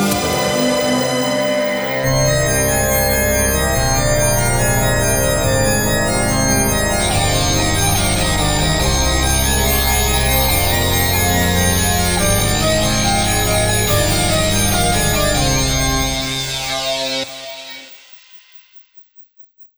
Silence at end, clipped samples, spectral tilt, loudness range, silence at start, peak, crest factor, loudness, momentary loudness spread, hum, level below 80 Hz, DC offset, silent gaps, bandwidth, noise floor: 0.1 s; under 0.1%; -3.5 dB/octave; 4 LU; 0 s; -2 dBFS; 14 dB; -15 LUFS; 4 LU; none; -24 dBFS; 0.7%; none; over 20 kHz; -45 dBFS